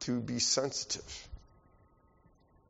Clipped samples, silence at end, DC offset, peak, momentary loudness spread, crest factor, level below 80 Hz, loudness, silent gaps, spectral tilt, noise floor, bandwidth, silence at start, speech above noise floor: under 0.1%; 1.3 s; under 0.1%; -16 dBFS; 22 LU; 20 dB; -58 dBFS; -32 LUFS; none; -3.5 dB/octave; -66 dBFS; 8 kHz; 0 s; 31 dB